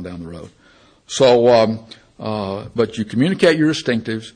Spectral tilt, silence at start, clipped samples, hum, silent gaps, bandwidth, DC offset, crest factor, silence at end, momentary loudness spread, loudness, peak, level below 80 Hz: -5.5 dB/octave; 0 s; under 0.1%; none; none; 10 kHz; under 0.1%; 16 dB; 0.05 s; 18 LU; -17 LUFS; -2 dBFS; -54 dBFS